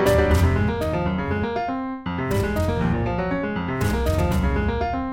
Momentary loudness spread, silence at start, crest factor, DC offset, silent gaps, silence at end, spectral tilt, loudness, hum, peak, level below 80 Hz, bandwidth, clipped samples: 7 LU; 0 s; 16 dB; under 0.1%; none; 0 s; -7 dB/octave; -23 LUFS; none; -6 dBFS; -30 dBFS; 16.5 kHz; under 0.1%